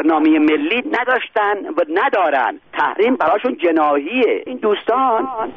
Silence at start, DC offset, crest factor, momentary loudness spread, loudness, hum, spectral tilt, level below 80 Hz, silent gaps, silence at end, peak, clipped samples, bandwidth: 0 s; 0.1%; 12 dB; 5 LU; -16 LUFS; none; -1 dB/octave; -62 dBFS; none; 0 s; -4 dBFS; under 0.1%; 5 kHz